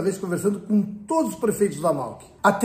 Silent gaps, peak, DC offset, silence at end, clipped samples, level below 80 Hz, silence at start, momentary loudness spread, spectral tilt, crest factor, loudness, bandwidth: none; -4 dBFS; under 0.1%; 0 s; under 0.1%; -60 dBFS; 0 s; 3 LU; -6 dB/octave; 20 dB; -24 LUFS; 15.5 kHz